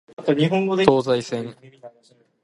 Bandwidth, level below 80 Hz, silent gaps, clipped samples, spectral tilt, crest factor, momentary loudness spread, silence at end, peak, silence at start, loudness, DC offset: 11.5 kHz; -58 dBFS; none; under 0.1%; -6.5 dB/octave; 22 dB; 12 LU; 0.55 s; 0 dBFS; 0.2 s; -20 LUFS; under 0.1%